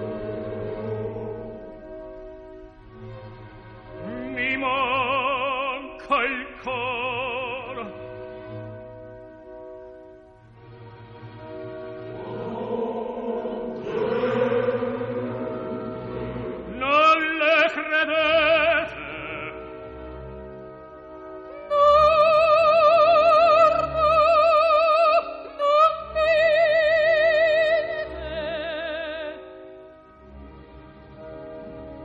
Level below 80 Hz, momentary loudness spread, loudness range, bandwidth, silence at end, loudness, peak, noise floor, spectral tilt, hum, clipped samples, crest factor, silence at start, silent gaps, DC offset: -50 dBFS; 24 LU; 20 LU; 8 kHz; 0 s; -21 LUFS; -6 dBFS; -49 dBFS; -5.5 dB/octave; none; under 0.1%; 16 dB; 0 s; none; under 0.1%